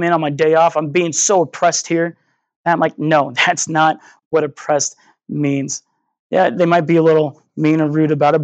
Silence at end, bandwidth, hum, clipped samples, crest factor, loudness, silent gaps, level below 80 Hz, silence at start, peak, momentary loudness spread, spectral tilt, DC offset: 0 s; 9.2 kHz; none; under 0.1%; 14 dB; -16 LUFS; 2.56-2.64 s, 4.25-4.31 s, 6.19-6.30 s; -72 dBFS; 0 s; -2 dBFS; 9 LU; -4.5 dB/octave; under 0.1%